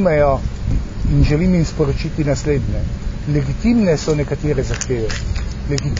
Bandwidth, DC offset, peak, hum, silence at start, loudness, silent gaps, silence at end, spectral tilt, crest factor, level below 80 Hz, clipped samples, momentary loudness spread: 7.6 kHz; under 0.1%; -2 dBFS; none; 0 s; -18 LUFS; none; 0 s; -6.5 dB/octave; 14 dB; -24 dBFS; under 0.1%; 8 LU